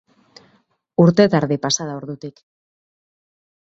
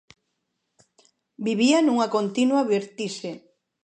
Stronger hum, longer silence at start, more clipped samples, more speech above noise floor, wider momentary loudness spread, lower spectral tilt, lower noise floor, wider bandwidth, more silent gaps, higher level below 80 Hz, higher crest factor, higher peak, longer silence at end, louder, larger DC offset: neither; second, 1 s vs 1.4 s; neither; second, 44 dB vs 55 dB; first, 19 LU vs 15 LU; about the same, -5.5 dB/octave vs -4.5 dB/octave; second, -61 dBFS vs -77 dBFS; second, 7.8 kHz vs 9.4 kHz; neither; first, -58 dBFS vs -76 dBFS; about the same, 20 dB vs 18 dB; first, 0 dBFS vs -8 dBFS; first, 1.3 s vs 0.45 s; first, -17 LUFS vs -23 LUFS; neither